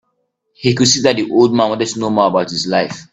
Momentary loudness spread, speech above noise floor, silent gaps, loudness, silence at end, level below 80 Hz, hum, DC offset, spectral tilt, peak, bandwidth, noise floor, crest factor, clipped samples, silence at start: 6 LU; 54 dB; none; -14 LUFS; 0.1 s; -52 dBFS; none; under 0.1%; -4 dB/octave; 0 dBFS; 9 kHz; -68 dBFS; 16 dB; under 0.1%; 0.6 s